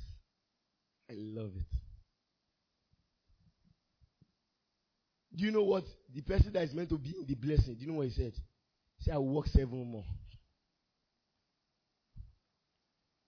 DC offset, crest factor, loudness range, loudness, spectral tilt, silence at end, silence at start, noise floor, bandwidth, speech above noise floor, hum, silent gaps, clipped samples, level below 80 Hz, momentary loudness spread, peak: under 0.1%; 22 dB; 15 LU; -35 LUFS; -7.5 dB/octave; 1 s; 0 s; -84 dBFS; 5.4 kHz; 50 dB; none; none; under 0.1%; -42 dBFS; 17 LU; -16 dBFS